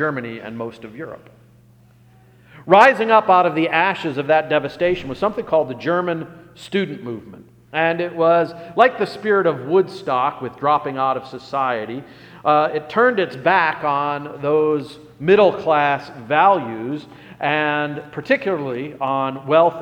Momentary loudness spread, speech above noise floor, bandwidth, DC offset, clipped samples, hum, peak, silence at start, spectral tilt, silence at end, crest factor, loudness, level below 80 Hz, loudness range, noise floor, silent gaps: 15 LU; 32 dB; 10.5 kHz; under 0.1%; under 0.1%; none; 0 dBFS; 0 s; -6.5 dB/octave; 0 s; 18 dB; -18 LUFS; -58 dBFS; 5 LU; -50 dBFS; none